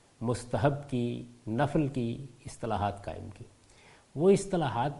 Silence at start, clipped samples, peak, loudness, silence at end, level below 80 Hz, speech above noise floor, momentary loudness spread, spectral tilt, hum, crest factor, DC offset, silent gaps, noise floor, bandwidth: 0.2 s; under 0.1%; -10 dBFS; -31 LUFS; 0 s; -54 dBFS; 28 dB; 18 LU; -7 dB/octave; none; 20 dB; under 0.1%; none; -58 dBFS; 11.5 kHz